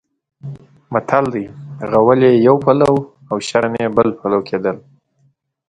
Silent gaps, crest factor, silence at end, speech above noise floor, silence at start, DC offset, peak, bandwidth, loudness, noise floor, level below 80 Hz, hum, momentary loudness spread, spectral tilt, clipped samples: none; 16 dB; 0.9 s; 46 dB; 0.45 s; under 0.1%; 0 dBFS; 11 kHz; -15 LUFS; -60 dBFS; -52 dBFS; none; 20 LU; -7 dB/octave; under 0.1%